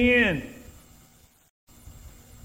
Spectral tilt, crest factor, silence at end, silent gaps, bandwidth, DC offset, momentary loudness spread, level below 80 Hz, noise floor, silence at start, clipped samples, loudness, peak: -5.5 dB/octave; 20 dB; 0.35 s; 1.50-1.67 s; 16 kHz; under 0.1%; 29 LU; -46 dBFS; -57 dBFS; 0 s; under 0.1%; -23 LUFS; -8 dBFS